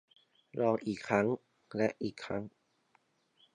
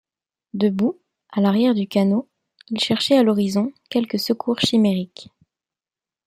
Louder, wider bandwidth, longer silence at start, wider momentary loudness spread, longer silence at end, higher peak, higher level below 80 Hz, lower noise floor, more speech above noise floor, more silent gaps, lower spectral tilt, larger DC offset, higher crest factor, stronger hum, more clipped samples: second, -35 LUFS vs -20 LUFS; second, 10.5 kHz vs 15.5 kHz; about the same, 0.55 s vs 0.55 s; about the same, 12 LU vs 11 LU; about the same, 1.05 s vs 1.05 s; second, -14 dBFS vs -4 dBFS; second, -70 dBFS vs -64 dBFS; second, -73 dBFS vs under -90 dBFS; second, 40 dB vs over 71 dB; neither; about the same, -6.5 dB/octave vs -6 dB/octave; neither; about the same, 22 dB vs 18 dB; neither; neither